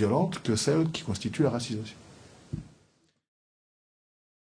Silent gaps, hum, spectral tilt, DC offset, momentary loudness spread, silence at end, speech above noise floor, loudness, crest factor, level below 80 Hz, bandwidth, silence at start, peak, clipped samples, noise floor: none; none; -5.5 dB/octave; under 0.1%; 16 LU; 1.8 s; 39 dB; -29 LUFS; 20 dB; -60 dBFS; 10.5 kHz; 0 s; -12 dBFS; under 0.1%; -67 dBFS